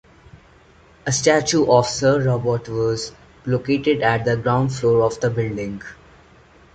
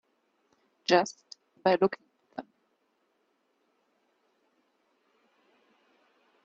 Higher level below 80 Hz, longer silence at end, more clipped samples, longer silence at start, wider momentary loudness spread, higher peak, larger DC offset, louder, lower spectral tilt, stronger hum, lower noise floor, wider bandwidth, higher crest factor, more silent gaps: first, -48 dBFS vs -80 dBFS; second, 0.8 s vs 4.05 s; neither; second, 0.35 s vs 0.9 s; second, 14 LU vs 19 LU; first, -2 dBFS vs -8 dBFS; neither; first, -19 LUFS vs -28 LUFS; about the same, -5 dB/octave vs -4.5 dB/octave; neither; second, -50 dBFS vs -74 dBFS; first, 9.2 kHz vs 8 kHz; second, 18 dB vs 28 dB; neither